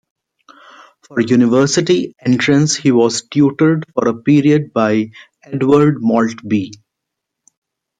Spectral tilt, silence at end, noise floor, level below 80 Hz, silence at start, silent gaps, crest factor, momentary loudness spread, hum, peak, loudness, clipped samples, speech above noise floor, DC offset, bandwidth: -5.5 dB/octave; 1.25 s; -78 dBFS; -56 dBFS; 1.1 s; none; 14 dB; 8 LU; none; -2 dBFS; -14 LUFS; under 0.1%; 65 dB; under 0.1%; 9.4 kHz